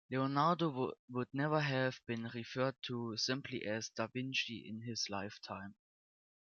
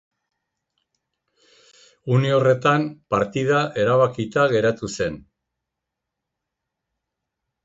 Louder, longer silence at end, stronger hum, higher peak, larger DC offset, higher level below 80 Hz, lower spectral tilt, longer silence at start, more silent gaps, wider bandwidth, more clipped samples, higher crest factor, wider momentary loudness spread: second, -38 LUFS vs -20 LUFS; second, 0.85 s vs 2.45 s; neither; second, -20 dBFS vs -6 dBFS; neither; second, -82 dBFS vs -56 dBFS; second, -5 dB/octave vs -6.5 dB/octave; second, 0.1 s vs 2.05 s; first, 0.99-1.08 s vs none; second, 7.2 kHz vs 8 kHz; neither; about the same, 20 dB vs 18 dB; about the same, 11 LU vs 9 LU